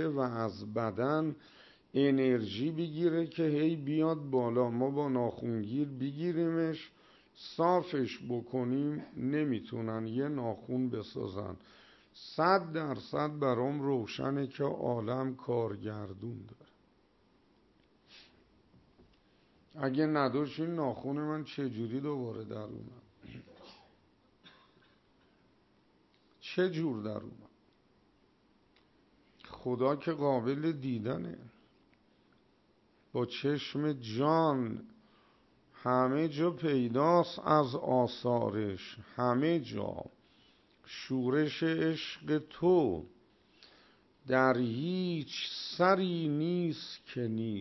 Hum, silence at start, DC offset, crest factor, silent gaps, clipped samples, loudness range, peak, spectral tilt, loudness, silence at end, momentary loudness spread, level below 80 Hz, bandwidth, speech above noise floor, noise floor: none; 0 s; under 0.1%; 22 dB; none; under 0.1%; 9 LU; -14 dBFS; -7.5 dB/octave; -33 LUFS; 0 s; 14 LU; -72 dBFS; 6.2 kHz; 36 dB; -69 dBFS